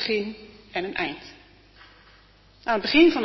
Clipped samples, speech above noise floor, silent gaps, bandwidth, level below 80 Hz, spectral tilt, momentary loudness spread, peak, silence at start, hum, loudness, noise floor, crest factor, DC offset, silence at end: under 0.1%; 32 dB; none; 6 kHz; -56 dBFS; -5.5 dB/octave; 23 LU; -6 dBFS; 0 s; none; -24 LUFS; -55 dBFS; 20 dB; under 0.1%; 0 s